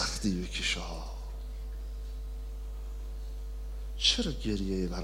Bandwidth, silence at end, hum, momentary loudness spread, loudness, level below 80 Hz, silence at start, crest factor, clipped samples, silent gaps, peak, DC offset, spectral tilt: 16 kHz; 0 s; 50 Hz at -40 dBFS; 15 LU; -34 LUFS; -38 dBFS; 0 s; 22 dB; under 0.1%; none; -12 dBFS; under 0.1%; -3.5 dB/octave